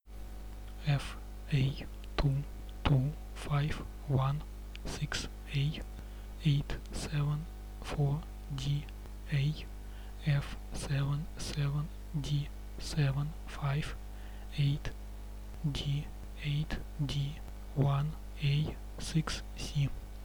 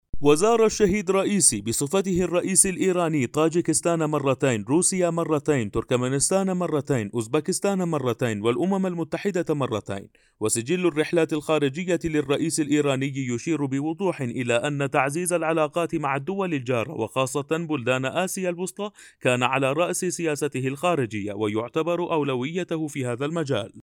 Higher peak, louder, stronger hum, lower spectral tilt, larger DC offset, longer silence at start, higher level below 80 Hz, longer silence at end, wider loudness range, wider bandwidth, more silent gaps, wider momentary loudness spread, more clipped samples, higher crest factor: second, -14 dBFS vs -2 dBFS; second, -35 LUFS vs -24 LUFS; first, 50 Hz at -45 dBFS vs none; first, -6 dB/octave vs -4.5 dB/octave; neither; about the same, 0.05 s vs 0.15 s; first, -44 dBFS vs -52 dBFS; about the same, 0 s vs 0.05 s; about the same, 2 LU vs 4 LU; about the same, 19.5 kHz vs 19 kHz; neither; first, 15 LU vs 8 LU; neither; about the same, 20 dB vs 20 dB